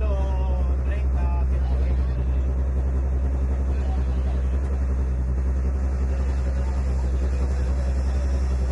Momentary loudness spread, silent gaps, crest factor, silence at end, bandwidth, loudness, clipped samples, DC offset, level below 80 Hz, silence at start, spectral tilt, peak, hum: 1 LU; none; 8 dB; 0 s; 7.4 kHz; -25 LUFS; under 0.1%; under 0.1%; -22 dBFS; 0 s; -8.5 dB/octave; -14 dBFS; none